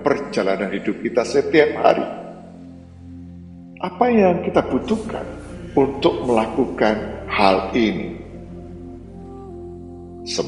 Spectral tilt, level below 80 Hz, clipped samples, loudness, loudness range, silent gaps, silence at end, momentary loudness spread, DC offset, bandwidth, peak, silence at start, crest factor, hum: -5.5 dB/octave; -44 dBFS; under 0.1%; -19 LUFS; 2 LU; none; 0 s; 22 LU; under 0.1%; 11 kHz; 0 dBFS; 0 s; 20 dB; none